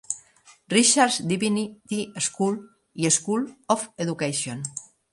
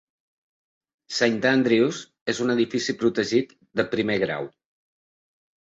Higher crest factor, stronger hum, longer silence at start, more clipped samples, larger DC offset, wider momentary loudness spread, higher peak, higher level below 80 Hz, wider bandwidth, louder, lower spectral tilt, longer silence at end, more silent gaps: about the same, 22 dB vs 20 dB; neither; second, 0.1 s vs 1.1 s; neither; neither; first, 15 LU vs 11 LU; about the same, -4 dBFS vs -6 dBFS; about the same, -68 dBFS vs -64 dBFS; first, 11.5 kHz vs 8 kHz; about the same, -24 LUFS vs -24 LUFS; second, -3 dB/octave vs -4.5 dB/octave; second, 0.3 s vs 1.2 s; second, none vs 2.21-2.26 s